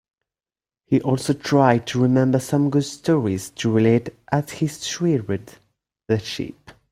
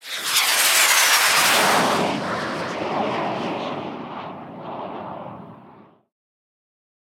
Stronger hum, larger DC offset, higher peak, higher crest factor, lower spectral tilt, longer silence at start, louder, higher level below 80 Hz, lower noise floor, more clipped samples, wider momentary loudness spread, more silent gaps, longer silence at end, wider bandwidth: neither; neither; about the same, -2 dBFS vs -4 dBFS; about the same, 18 dB vs 20 dB; first, -6.5 dB/octave vs -1 dB/octave; first, 0.9 s vs 0.05 s; second, -21 LUFS vs -18 LUFS; first, -56 dBFS vs -66 dBFS; first, under -90 dBFS vs -49 dBFS; neither; second, 9 LU vs 20 LU; neither; second, 0.2 s vs 1.45 s; second, 15.5 kHz vs 18 kHz